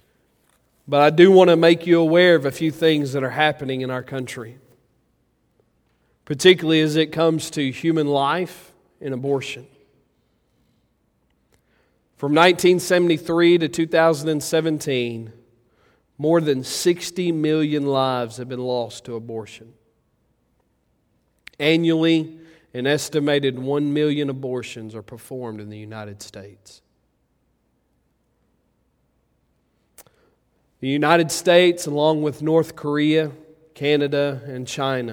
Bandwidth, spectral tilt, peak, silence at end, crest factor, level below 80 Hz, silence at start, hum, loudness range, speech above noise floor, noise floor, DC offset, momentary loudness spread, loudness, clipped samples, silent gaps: 17 kHz; -5 dB/octave; 0 dBFS; 0 s; 22 dB; -64 dBFS; 0.85 s; none; 14 LU; 48 dB; -67 dBFS; under 0.1%; 18 LU; -19 LUFS; under 0.1%; none